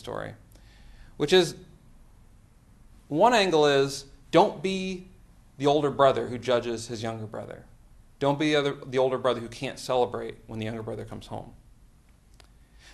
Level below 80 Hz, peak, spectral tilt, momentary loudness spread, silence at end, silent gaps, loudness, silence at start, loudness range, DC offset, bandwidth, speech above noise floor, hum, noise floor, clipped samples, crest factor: -56 dBFS; -6 dBFS; -5 dB/octave; 17 LU; 1.45 s; none; -26 LUFS; 0.05 s; 6 LU; under 0.1%; 12.5 kHz; 31 dB; none; -56 dBFS; under 0.1%; 22 dB